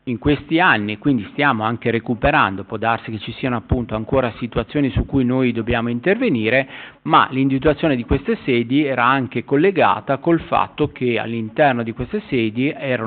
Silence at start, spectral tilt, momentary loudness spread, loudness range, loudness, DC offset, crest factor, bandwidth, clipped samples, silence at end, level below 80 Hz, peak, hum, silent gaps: 0.05 s; -4.5 dB/octave; 7 LU; 3 LU; -19 LUFS; under 0.1%; 16 dB; 4.6 kHz; under 0.1%; 0 s; -38 dBFS; -2 dBFS; none; none